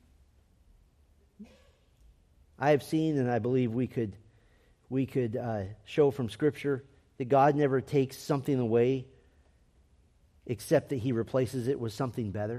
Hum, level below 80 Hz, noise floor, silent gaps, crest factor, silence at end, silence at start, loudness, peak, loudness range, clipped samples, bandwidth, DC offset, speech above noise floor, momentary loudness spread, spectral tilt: none; -64 dBFS; -64 dBFS; none; 18 dB; 0 s; 1.4 s; -30 LUFS; -12 dBFS; 4 LU; under 0.1%; 14.5 kHz; under 0.1%; 35 dB; 9 LU; -7.5 dB/octave